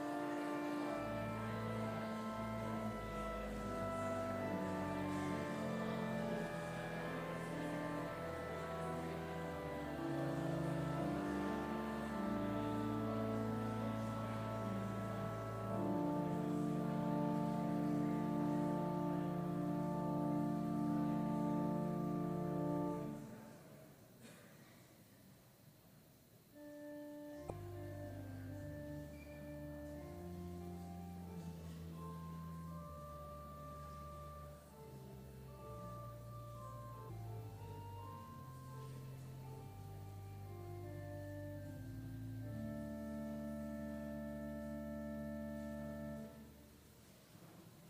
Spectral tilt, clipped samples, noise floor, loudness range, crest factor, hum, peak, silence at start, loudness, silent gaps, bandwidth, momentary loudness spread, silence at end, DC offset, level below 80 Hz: -7.5 dB/octave; under 0.1%; -65 dBFS; 13 LU; 16 dB; none; -26 dBFS; 0 s; -44 LUFS; none; 15.5 kHz; 15 LU; 0 s; under 0.1%; -62 dBFS